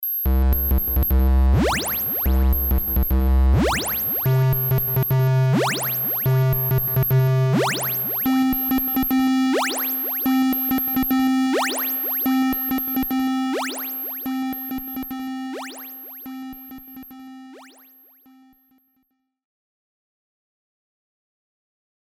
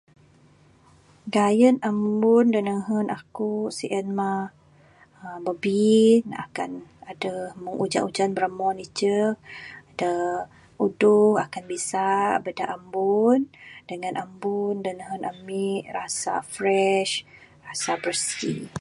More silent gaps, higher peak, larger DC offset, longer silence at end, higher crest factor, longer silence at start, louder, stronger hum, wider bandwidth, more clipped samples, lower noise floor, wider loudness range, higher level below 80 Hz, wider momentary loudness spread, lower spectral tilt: neither; second, -10 dBFS vs -6 dBFS; neither; first, 4.4 s vs 0 s; second, 10 dB vs 18 dB; second, 0 s vs 1.25 s; first, -20 LUFS vs -24 LUFS; neither; first, over 20 kHz vs 11.5 kHz; neither; first, -71 dBFS vs -56 dBFS; first, 13 LU vs 4 LU; first, -26 dBFS vs -66 dBFS; about the same, 14 LU vs 15 LU; first, -6 dB/octave vs -4.5 dB/octave